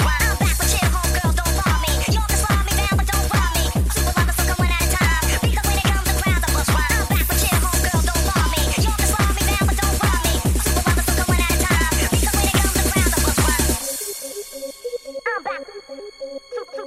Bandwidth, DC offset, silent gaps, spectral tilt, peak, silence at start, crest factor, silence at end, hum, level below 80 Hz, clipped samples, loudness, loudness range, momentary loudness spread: 16 kHz; under 0.1%; none; -3.5 dB/octave; -4 dBFS; 0 s; 14 dB; 0 s; none; -22 dBFS; under 0.1%; -19 LUFS; 2 LU; 12 LU